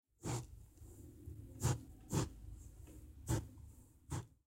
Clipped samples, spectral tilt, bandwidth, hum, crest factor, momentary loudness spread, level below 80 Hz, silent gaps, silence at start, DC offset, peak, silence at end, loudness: under 0.1%; -5.5 dB/octave; 16 kHz; none; 22 dB; 19 LU; -56 dBFS; none; 0.2 s; under 0.1%; -24 dBFS; 0.15 s; -44 LUFS